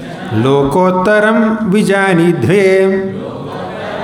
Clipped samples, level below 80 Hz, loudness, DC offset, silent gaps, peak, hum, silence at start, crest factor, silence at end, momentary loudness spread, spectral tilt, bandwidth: under 0.1%; -44 dBFS; -11 LUFS; under 0.1%; none; 0 dBFS; none; 0 s; 10 dB; 0 s; 13 LU; -6.5 dB/octave; 15.5 kHz